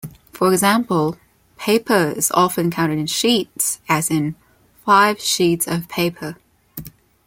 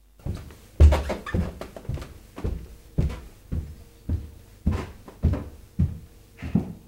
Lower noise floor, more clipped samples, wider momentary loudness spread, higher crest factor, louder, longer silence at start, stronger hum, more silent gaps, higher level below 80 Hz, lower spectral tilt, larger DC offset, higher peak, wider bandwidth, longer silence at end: second, -37 dBFS vs -44 dBFS; neither; second, 17 LU vs 20 LU; about the same, 18 dB vs 22 dB; first, -18 LUFS vs -28 LUFS; second, 0.05 s vs 0.25 s; neither; neither; second, -56 dBFS vs -28 dBFS; second, -4 dB/octave vs -8 dB/octave; neither; about the same, -2 dBFS vs -4 dBFS; first, 17 kHz vs 10 kHz; first, 0.35 s vs 0.1 s